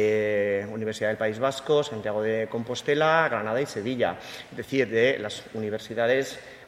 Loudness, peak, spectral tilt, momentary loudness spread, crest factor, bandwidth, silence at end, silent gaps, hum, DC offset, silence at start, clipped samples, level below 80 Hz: -26 LUFS; -6 dBFS; -5 dB/octave; 10 LU; 20 dB; 15 kHz; 0 s; none; none; under 0.1%; 0 s; under 0.1%; -66 dBFS